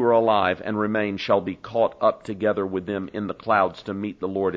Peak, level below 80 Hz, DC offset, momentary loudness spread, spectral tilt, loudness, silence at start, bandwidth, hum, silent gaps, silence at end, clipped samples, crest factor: -6 dBFS; -60 dBFS; under 0.1%; 9 LU; -7.5 dB/octave; -24 LUFS; 0 s; 7.8 kHz; none; none; 0 s; under 0.1%; 18 dB